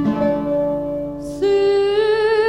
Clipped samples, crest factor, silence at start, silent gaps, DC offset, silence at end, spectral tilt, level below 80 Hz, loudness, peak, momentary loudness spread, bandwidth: under 0.1%; 10 dB; 0 s; none; 0.2%; 0 s; -6.5 dB/octave; -44 dBFS; -18 LUFS; -8 dBFS; 9 LU; 11 kHz